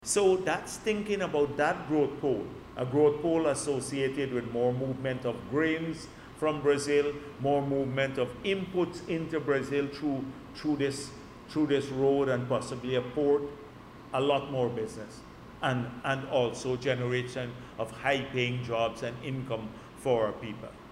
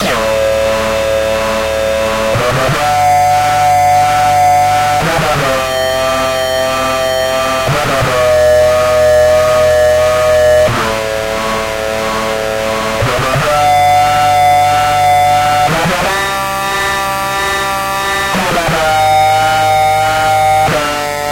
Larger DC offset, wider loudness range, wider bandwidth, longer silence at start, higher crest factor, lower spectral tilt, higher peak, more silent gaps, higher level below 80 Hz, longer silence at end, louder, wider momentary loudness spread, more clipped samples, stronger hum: neither; about the same, 3 LU vs 3 LU; second, 13 kHz vs 16.5 kHz; about the same, 0 s vs 0 s; first, 18 dB vs 8 dB; first, -5 dB/octave vs -3.5 dB/octave; second, -12 dBFS vs -2 dBFS; neither; second, -58 dBFS vs -32 dBFS; about the same, 0 s vs 0 s; second, -30 LUFS vs -11 LUFS; first, 12 LU vs 6 LU; neither; neither